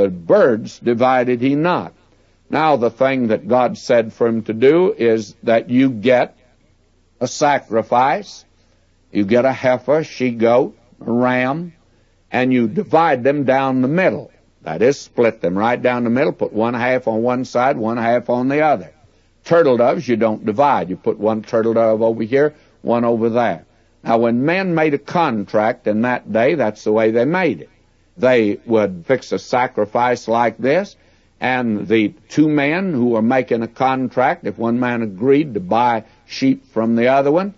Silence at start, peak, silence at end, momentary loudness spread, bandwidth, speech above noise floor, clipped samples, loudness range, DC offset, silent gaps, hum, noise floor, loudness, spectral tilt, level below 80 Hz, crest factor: 0 s; -2 dBFS; 0.05 s; 6 LU; 7.8 kHz; 40 dB; under 0.1%; 2 LU; under 0.1%; none; none; -56 dBFS; -17 LUFS; -6.5 dB/octave; -58 dBFS; 14 dB